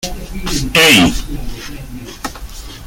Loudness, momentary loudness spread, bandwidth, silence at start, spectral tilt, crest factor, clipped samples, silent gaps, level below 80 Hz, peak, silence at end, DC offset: -10 LUFS; 23 LU; 17 kHz; 0 s; -3 dB/octave; 16 dB; under 0.1%; none; -26 dBFS; 0 dBFS; 0 s; under 0.1%